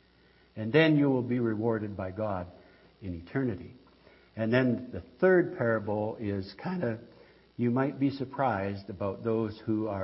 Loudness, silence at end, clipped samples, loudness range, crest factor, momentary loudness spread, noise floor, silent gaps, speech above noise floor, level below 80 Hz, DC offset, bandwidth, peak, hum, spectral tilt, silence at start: -30 LUFS; 0 s; under 0.1%; 4 LU; 20 dB; 17 LU; -62 dBFS; none; 33 dB; -64 dBFS; under 0.1%; 5.8 kHz; -10 dBFS; none; -11 dB/octave; 0.55 s